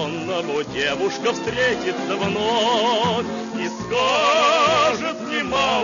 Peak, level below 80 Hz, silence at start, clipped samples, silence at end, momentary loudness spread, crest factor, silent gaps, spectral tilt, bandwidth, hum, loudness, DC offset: -6 dBFS; -52 dBFS; 0 s; under 0.1%; 0 s; 9 LU; 14 dB; none; -3.5 dB/octave; 7.4 kHz; none; -20 LUFS; under 0.1%